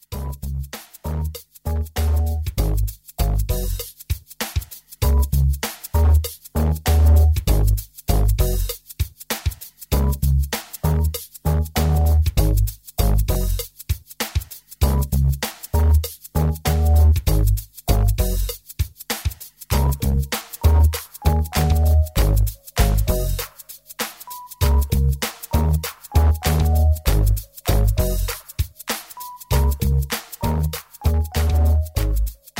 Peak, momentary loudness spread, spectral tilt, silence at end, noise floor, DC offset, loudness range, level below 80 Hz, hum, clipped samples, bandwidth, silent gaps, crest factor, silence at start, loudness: -4 dBFS; 11 LU; -5.5 dB/octave; 0 s; -41 dBFS; under 0.1%; 4 LU; -22 dBFS; none; under 0.1%; 16.5 kHz; none; 16 dB; 0.1 s; -21 LUFS